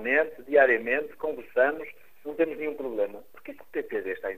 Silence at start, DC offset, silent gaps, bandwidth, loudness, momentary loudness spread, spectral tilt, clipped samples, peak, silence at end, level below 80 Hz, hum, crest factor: 0 s; 0.4%; none; 15.5 kHz; -27 LUFS; 21 LU; -6 dB/octave; under 0.1%; -6 dBFS; 0 s; -66 dBFS; none; 22 dB